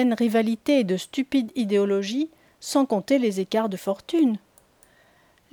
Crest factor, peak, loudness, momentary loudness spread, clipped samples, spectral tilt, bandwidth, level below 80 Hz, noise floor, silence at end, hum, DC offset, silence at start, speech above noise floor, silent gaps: 14 dB; -10 dBFS; -24 LUFS; 7 LU; under 0.1%; -5.5 dB/octave; 20 kHz; -68 dBFS; -59 dBFS; 1.15 s; none; under 0.1%; 0 s; 37 dB; none